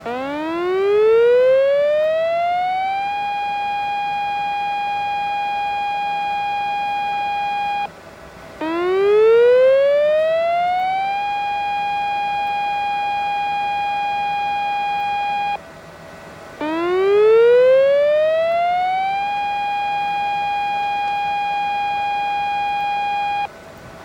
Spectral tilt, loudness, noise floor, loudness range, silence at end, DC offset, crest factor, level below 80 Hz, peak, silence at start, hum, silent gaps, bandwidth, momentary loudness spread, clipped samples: -4.5 dB/octave; -19 LUFS; -39 dBFS; 6 LU; 0 s; under 0.1%; 12 dB; -56 dBFS; -6 dBFS; 0 s; none; none; 16 kHz; 10 LU; under 0.1%